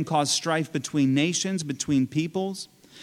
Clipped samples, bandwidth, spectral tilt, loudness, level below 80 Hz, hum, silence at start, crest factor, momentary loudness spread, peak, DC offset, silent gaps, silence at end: under 0.1%; 14.5 kHz; -4 dB/octave; -25 LUFS; -64 dBFS; none; 0 s; 16 dB; 9 LU; -10 dBFS; under 0.1%; none; 0 s